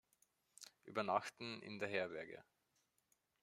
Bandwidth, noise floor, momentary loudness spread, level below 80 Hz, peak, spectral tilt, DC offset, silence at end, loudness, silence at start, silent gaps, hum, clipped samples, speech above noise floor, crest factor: 15.5 kHz; -83 dBFS; 19 LU; -88 dBFS; -22 dBFS; -4 dB/octave; under 0.1%; 1 s; -44 LUFS; 0.6 s; none; none; under 0.1%; 39 dB; 24 dB